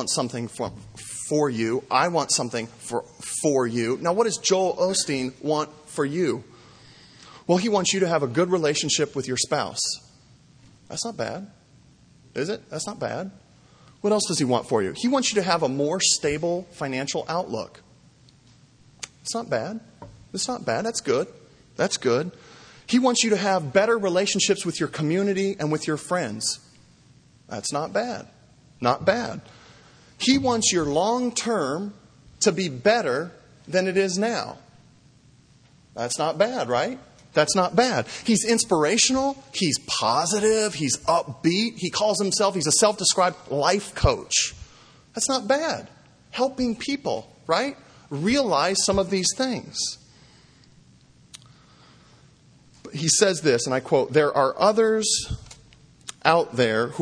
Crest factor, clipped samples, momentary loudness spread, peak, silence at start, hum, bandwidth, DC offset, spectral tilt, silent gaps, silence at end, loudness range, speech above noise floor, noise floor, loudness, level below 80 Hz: 24 dB; under 0.1%; 12 LU; 0 dBFS; 0 s; none; 10.5 kHz; under 0.1%; -3.5 dB/octave; none; 0 s; 8 LU; 32 dB; -55 dBFS; -23 LUFS; -52 dBFS